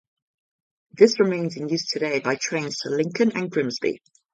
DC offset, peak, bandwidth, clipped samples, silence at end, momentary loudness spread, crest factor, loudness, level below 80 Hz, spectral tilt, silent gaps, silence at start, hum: under 0.1%; -2 dBFS; 9 kHz; under 0.1%; 0.35 s; 9 LU; 22 dB; -23 LUFS; -70 dBFS; -4.5 dB/octave; none; 0.95 s; none